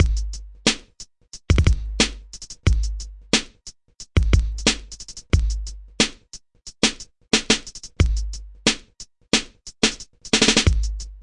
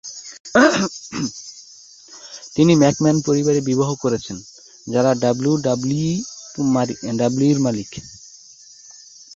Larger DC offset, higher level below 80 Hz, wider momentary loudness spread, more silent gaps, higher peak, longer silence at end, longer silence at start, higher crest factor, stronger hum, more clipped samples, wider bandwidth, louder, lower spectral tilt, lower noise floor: neither; first, -26 dBFS vs -54 dBFS; about the same, 21 LU vs 22 LU; second, none vs 0.40-0.44 s; about the same, 0 dBFS vs -2 dBFS; second, 0 s vs 1.2 s; about the same, 0 s vs 0.05 s; about the same, 22 dB vs 18 dB; neither; neither; first, 11 kHz vs 7.8 kHz; about the same, -21 LUFS vs -19 LUFS; second, -3.5 dB/octave vs -5.5 dB/octave; about the same, -45 dBFS vs -45 dBFS